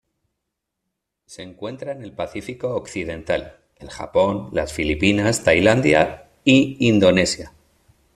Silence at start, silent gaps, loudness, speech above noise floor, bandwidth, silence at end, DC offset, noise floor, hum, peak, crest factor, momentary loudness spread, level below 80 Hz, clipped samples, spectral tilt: 1.3 s; none; -19 LUFS; 60 dB; 13.5 kHz; 0.65 s; under 0.1%; -80 dBFS; none; -2 dBFS; 18 dB; 16 LU; -46 dBFS; under 0.1%; -5 dB/octave